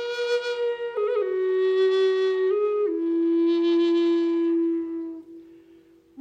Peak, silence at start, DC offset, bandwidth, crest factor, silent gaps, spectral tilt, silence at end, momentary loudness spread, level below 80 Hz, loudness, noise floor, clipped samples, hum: -14 dBFS; 0 s; under 0.1%; 7.6 kHz; 10 dB; none; -4 dB/octave; 0 s; 7 LU; -76 dBFS; -23 LUFS; -54 dBFS; under 0.1%; none